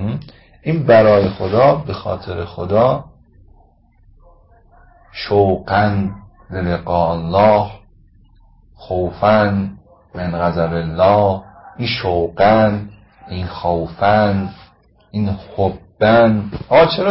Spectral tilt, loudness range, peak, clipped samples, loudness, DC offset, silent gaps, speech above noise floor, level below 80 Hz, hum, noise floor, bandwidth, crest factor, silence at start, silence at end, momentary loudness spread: -11.5 dB/octave; 5 LU; 0 dBFS; under 0.1%; -16 LUFS; under 0.1%; none; 36 dB; -38 dBFS; none; -51 dBFS; 5.8 kHz; 16 dB; 0 s; 0 s; 15 LU